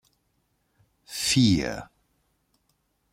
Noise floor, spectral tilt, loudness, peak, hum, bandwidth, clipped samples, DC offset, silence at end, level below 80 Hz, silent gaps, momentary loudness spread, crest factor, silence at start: -72 dBFS; -4 dB/octave; -23 LUFS; -10 dBFS; none; 16.5 kHz; under 0.1%; under 0.1%; 1.3 s; -52 dBFS; none; 17 LU; 20 dB; 1.1 s